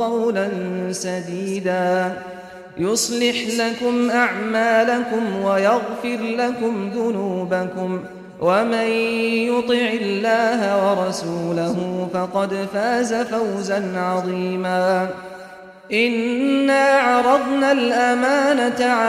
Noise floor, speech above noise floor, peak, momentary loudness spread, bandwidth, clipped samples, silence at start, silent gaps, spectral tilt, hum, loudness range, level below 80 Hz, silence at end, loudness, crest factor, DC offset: -40 dBFS; 20 dB; -4 dBFS; 8 LU; 15 kHz; under 0.1%; 0 s; none; -4.5 dB/octave; none; 4 LU; -60 dBFS; 0 s; -20 LUFS; 16 dB; under 0.1%